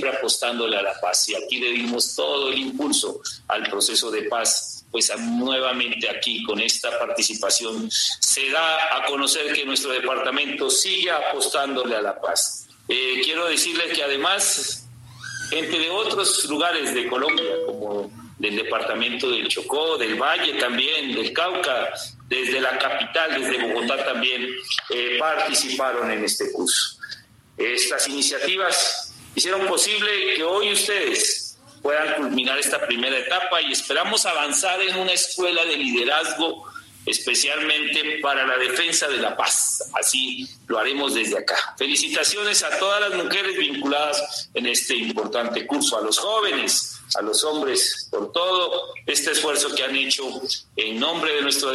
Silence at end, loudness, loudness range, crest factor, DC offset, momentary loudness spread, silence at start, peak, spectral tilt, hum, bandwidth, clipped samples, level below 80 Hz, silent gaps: 0 s; -21 LUFS; 2 LU; 18 dB; under 0.1%; 6 LU; 0 s; -6 dBFS; 0 dB/octave; none; 14 kHz; under 0.1%; -70 dBFS; none